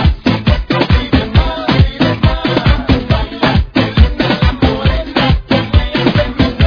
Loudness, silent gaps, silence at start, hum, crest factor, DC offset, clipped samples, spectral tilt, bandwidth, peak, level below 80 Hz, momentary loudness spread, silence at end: -13 LUFS; none; 0 s; none; 12 dB; under 0.1%; 0.3%; -8 dB/octave; 5.4 kHz; 0 dBFS; -18 dBFS; 2 LU; 0 s